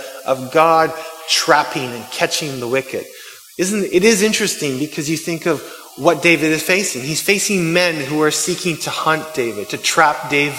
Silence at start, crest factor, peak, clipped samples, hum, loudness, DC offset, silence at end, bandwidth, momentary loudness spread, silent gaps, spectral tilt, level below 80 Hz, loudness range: 0 s; 18 dB; 0 dBFS; under 0.1%; none; -16 LUFS; under 0.1%; 0 s; 17 kHz; 9 LU; none; -3 dB/octave; -58 dBFS; 2 LU